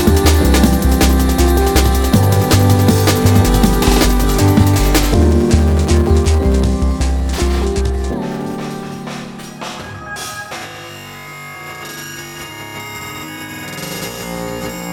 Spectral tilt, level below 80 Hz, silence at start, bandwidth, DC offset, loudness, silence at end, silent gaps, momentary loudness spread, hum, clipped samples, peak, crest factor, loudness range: -5.5 dB/octave; -18 dBFS; 0 s; 19 kHz; under 0.1%; -14 LUFS; 0 s; none; 16 LU; none; under 0.1%; 0 dBFS; 14 dB; 15 LU